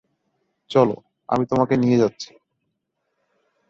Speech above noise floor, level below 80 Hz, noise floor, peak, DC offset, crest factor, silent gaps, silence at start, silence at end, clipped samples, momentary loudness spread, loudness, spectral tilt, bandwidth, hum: 57 dB; -58 dBFS; -76 dBFS; -2 dBFS; under 0.1%; 20 dB; none; 0.7 s; 1.45 s; under 0.1%; 17 LU; -20 LUFS; -7 dB/octave; 7.4 kHz; none